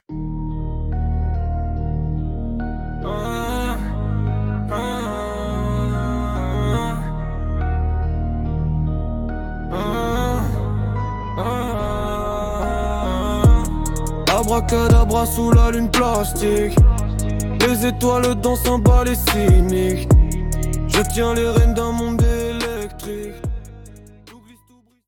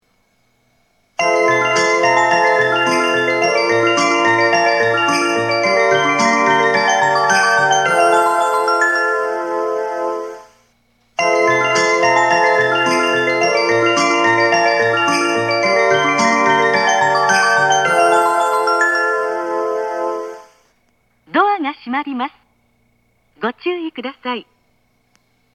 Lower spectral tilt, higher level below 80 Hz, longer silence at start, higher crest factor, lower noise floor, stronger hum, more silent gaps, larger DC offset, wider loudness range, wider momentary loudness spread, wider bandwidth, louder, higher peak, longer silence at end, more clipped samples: first, -6 dB/octave vs -3 dB/octave; first, -22 dBFS vs -68 dBFS; second, 0.1 s vs 1.2 s; about the same, 16 dB vs 16 dB; second, -55 dBFS vs -61 dBFS; neither; neither; neither; about the same, 7 LU vs 9 LU; about the same, 11 LU vs 10 LU; first, 18 kHz vs 14 kHz; second, -20 LUFS vs -14 LUFS; about the same, -2 dBFS vs 0 dBFS; second, 0.7 s vs 1.15 s; neither